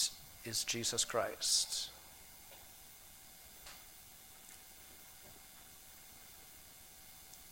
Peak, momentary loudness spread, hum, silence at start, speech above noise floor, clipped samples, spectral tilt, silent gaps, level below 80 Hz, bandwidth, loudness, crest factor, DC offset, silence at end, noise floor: -18 dBFS; 21 LU; none; 0 s; 20 dB; under 0.1%; -0.5 dB/octave; none; -68 dBFS; 19 kHz; -35 LUFS; 24 dB; under 0.1%; 0 s; -57 dBFS